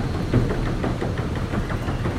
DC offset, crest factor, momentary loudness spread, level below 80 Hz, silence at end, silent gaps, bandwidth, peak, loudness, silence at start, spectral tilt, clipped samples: under 0.1%; 16 dB; 4 LU; -30 dBFS; 0 s; none; 14 kHz; -8 dBFS; -25 LUFS; 0 s; -7.5 dB/octave; under 0.1%